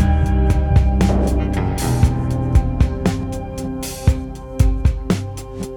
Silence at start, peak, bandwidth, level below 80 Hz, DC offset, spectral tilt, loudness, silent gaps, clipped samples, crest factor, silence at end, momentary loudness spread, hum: 0 s; -2 dBFS; 17.5 kHz; -20 dBFS; under 0.1%; -7 dB/octave; -19 LUFS; none; under 0.1%; 16 dB; 0 s; 10 LU; none